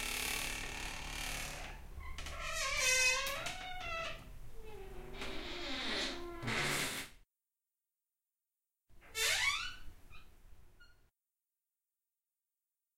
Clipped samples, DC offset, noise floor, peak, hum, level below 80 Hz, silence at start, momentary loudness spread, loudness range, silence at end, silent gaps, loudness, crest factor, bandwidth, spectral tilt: under 0.1%; under 0.1%; under -90 dBFS; -20 dBFS; none; -52 dBFS; 0 s; 20 LU; 6 LU; 2.05 s; none; -37 LUFS; 22 dB; 16.5 kHz; -1 dB/octave